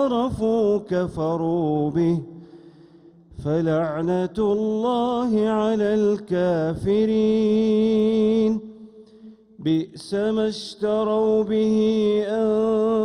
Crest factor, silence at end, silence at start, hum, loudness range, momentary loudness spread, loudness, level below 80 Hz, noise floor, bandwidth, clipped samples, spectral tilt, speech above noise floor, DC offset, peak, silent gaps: 10 dB; 0 s; 0 s; none; 4 LU; 6 LU; -22 LUFS; -52 dBFS; -50 dBFS; 10.5 kHz; under 0.1%; -7.5 dB/octave; 29 dB; under 0.1%; -10 dBFS; none